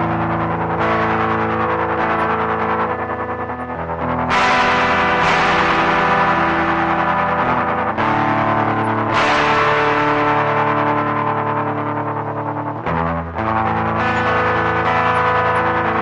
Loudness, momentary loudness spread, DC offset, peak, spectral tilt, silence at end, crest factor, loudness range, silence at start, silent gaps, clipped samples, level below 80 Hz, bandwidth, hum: -17 LUFS; 7 LU; under 0.1%; -2 dBFS; -6 dB/octave; 0 s; 14 dB; 4 LU; 0 s; none; under 0.1%; -44 dBFS; 10.5 kHz; none